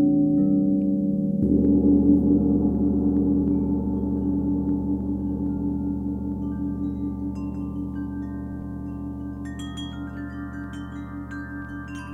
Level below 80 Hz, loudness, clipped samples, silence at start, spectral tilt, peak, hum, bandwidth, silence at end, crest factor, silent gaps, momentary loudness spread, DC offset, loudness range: -36 dBFS; -25 LUFS; under 0.1%; 0 s; -9.5 dB/octave; -8 dBFS; none; 7.4 kHz; 0 s; 16 dB; none; 15 LU; under 0.1%; 13 LU